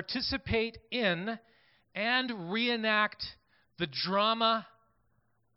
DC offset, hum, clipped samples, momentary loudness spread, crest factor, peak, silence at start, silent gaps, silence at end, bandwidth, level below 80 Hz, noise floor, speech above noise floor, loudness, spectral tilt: under 0.1%; none; under 0.1%; 12 LU; 20 dB; -14 dBFS; 0 s; none; 0.9 s; 5.8 kHz; -58 dBFS; -74 dBFS; 43 dB; -30 LUFS; -8 dB/octave